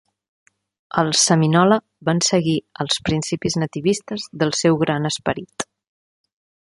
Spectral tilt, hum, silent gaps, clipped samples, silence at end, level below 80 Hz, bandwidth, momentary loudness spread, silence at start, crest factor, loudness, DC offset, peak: -4 dB/octave; none; none; under 0.1%; 1.1 s; -52 dBFS; 11.5 kHz; 11 LU; 0.95 s; 18 dB; -19 LUFS; under 0.1%; -2 dBFS